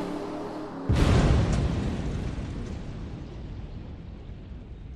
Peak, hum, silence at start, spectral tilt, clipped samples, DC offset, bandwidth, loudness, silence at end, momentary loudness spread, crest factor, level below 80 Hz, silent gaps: -10 dBFS; none; 0 s; -7 dB/octave; under 0.1%; under 0.1%; 11.5 kHz; -28 LUFS; 0 s; 20 LU; 18 dB; -32 dBFS; none